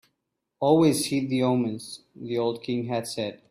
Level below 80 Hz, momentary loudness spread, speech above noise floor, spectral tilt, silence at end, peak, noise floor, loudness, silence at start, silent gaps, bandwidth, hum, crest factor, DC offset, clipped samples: -66 dBFS; 13 LU; 55 dB; -5.5 dB/octave; 0.15 s; -8 dBFS; -80 dBFS; -25 LUFS; 0.6 s; none; 15.5 kHz; none; 18 dB; under 0.1%; under 0.1%